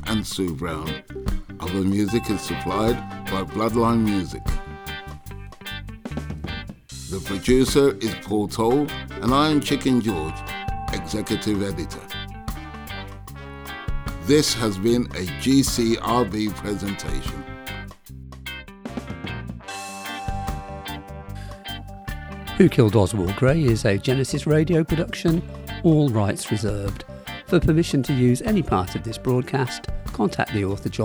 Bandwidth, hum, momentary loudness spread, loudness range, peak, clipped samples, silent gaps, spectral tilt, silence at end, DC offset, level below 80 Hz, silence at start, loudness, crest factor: over 20 kHz; none; 16 LU; 12 LU; -2 dBFS; under 0.1%; none; -5.5 dB/octave; 0 s; under 0.1%; -36 dBFS; 0 s; -23 LUFS; 20 dB